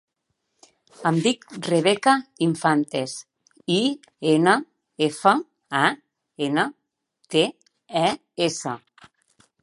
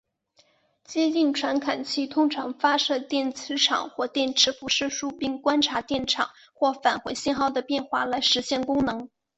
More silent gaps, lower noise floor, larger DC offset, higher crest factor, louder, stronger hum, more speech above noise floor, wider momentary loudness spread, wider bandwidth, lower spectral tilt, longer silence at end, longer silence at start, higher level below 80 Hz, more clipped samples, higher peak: neither; first, -76 dBFS vs -64 dBFS; neither; about the same, 22 dB vs 18 dB; about the same, -23 LUFS vs -25 LUFS; neither; first, 55 dB vs 39 dB; first, 11 LU vs 7 LU; first, 11.5 kHz vs 8.2 kHz; first, -4.5 dB/octave vs -2 dB/octave; first, 0.85 s vs 0.3 s; about the same, 1 s vs 0.9 s; second, -74 dBFS vs -60 dBFS; neither; first, -2 dBFS vs -6 dBFS